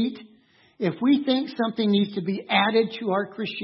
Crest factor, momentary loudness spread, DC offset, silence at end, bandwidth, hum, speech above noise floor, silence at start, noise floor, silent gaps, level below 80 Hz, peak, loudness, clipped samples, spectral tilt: 20 dB; 9 LU; under 0.1%; 0 s; 5.8 kHz; none; 34 dB; 0 s; -58 dBFS; none; -74 dBFS; -4 dBFS; -24 LUFS; under 0.1%; -9 dB/octave